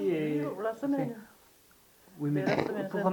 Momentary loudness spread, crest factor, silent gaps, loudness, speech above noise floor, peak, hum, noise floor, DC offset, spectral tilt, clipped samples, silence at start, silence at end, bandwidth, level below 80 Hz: 8 LU; 18 dB; none; -32 LUFS; 30 dB; -14 dBFS; none; -61 dBFS; under 0.1%; -7.5 dB/octave; under 0.1%; 0 s; 0 s; 19 kHz; -70 dBFS